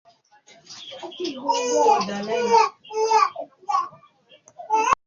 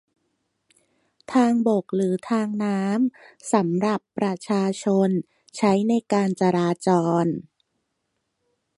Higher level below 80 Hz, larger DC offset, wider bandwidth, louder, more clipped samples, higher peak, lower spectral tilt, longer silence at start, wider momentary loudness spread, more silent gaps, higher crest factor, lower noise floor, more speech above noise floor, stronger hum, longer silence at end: about the same, -66 dBFS vs -68 dBFS; neither; second, 7.6 kHz vs 11.5 kHz; about the same, -22 LUFS vs -23 LUFS; neither; about the same, -4 dBFS vs -6 dBFS; second, -2.5 dB/octave vs -7 dB/octave; second, 0.7 s vs 1.3 s; first, 18 LU vs 7 LU; neither; about the same, 20 dB vs 18 dB; second, -55 dBFS vs -76 dBFS; second, 34 dB vs 55 dB; neither; second, 0.1 s vs 1.35 s